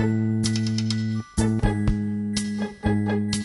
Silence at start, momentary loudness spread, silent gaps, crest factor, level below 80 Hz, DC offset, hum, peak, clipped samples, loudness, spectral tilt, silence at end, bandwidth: 0 s; 4 LU; none; 18 dB; -36 dBFS; under 0.1%; none; -6 dBFS; under 0.1%; -25 LUFS; -6 dB/octave; 0 s; 11.5 kHz